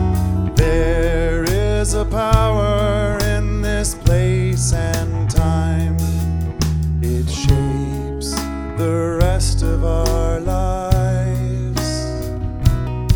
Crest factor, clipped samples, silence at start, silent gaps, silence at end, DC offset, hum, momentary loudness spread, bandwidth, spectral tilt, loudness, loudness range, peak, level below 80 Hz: 16 dB; under 0.1%; 0 s; none; 0 s; under 0.1%; none; 5 LU; over 20 kHz; -6 dB/octave; -19 LUFS; 2 LU; 0 dBFS; -22 dBFS